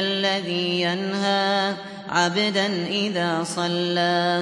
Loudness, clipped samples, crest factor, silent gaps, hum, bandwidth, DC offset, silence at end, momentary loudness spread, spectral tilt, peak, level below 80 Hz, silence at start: -22 LUFS; under 0.1%; 14 dB; none; none; 11.5 kHz; under 0.1%; 0 s; 4 LU; -4 dB/octave; -8 dBFS; -70 dBFS; 0 s